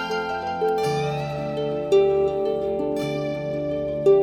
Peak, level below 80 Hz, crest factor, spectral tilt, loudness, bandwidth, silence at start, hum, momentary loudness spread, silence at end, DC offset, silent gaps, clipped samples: -8 dBFS; -50 dBFS; 14 dB; -6.5 dB/octave; -24 LUFS; 13 kHz; 0 s; none; 8 LU; 0 s; under 0.1%; none; under 0.1%